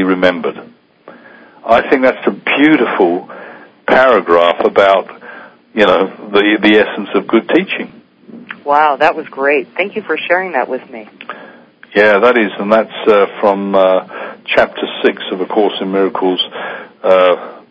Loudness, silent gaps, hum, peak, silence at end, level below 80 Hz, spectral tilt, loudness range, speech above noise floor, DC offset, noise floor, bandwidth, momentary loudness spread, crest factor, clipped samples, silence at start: -12 LUFS; none; none; 0 dBFS; 0.1 s; -54 dBFS; -6.5 dB/octave; 4 LU; 28 dB; under 0.1%; -40 dBFS; 8 kHz; 16 LU; 14 dB; 0.4%; 0 s